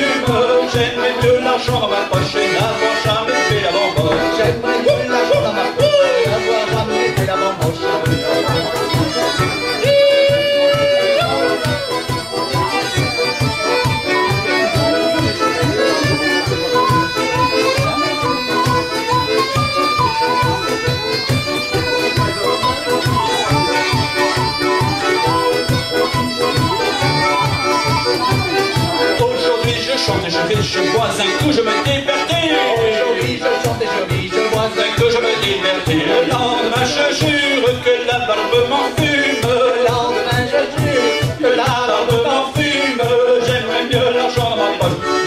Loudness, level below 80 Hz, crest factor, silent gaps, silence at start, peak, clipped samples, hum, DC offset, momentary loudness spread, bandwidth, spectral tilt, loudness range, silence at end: -15 LUFS; -42 dBFS; 14 dB; none; 0 s; -2 dBFS; under 0.1%; none; under 0.1%; 3 LU; 16 kHz; -4.5 dB/octave; 1 LU; 0 s